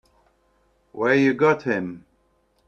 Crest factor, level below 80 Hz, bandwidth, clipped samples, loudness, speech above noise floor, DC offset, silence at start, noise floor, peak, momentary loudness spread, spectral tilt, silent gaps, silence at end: 20 dB; -64 dBFS; 7.2 kHz; under 0.1%; -21 LUFS; 45 dB; under 0.1%; 0.95 s; -65 dBFS; -4 dBFS; 22 LU; -7 dB/octave; none; 0.7 s